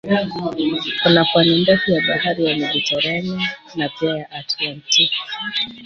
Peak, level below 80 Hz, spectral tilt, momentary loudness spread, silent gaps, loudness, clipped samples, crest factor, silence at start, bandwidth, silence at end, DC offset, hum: -2 dBFS; -56 dBFS; -4 dB/octave; 10 LU; none; -18 LUFS; under 0.1%; 18 dB; 0.05 s; 7.6 kHz; 0 s; under 0.1%; none